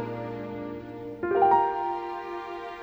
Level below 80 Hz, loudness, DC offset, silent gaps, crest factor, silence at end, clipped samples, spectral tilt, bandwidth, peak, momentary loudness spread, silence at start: -60 dBFS; -28 LUFS; under 0.1%; none; 18 dB; 0 s; under 0.1%; -8 dB/octave; over 20 kHz; -10 dBFS; 16 LU; 0 s